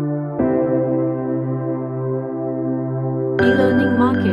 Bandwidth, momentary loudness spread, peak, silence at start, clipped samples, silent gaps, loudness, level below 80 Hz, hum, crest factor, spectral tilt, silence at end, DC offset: 5.4 kHz; 8 LU; -4 dBFS; 0 s; under 0.1%; none; -19 LUFS; -54 dBFS; none; 16 dB; -9 dB/octave; 0 s; under 0.1%